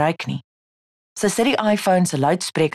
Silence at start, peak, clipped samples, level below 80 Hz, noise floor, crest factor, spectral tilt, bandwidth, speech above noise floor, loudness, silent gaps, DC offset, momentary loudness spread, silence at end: 0 s; -8 dBFS; under 0.1%; -58 dBFS; under -90 dBFS; 12 dB; -5 dB/octave; 13 kHz; over 71 dB; -20 LUFS; 0.44-1.16 s; under 0.1%; 12 LU; 0.05 s